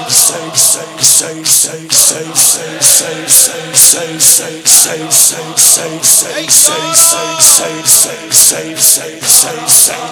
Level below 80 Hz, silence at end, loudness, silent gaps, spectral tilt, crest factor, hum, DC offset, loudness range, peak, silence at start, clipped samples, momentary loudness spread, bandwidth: -54 dBFS; 0 s; -6 LUFS; none; 0 dB/octave; 10 dB; none; under 0.1%; 1 LU; 0 dBFS; 0 s; 3%; 3 LU; over 20 kHz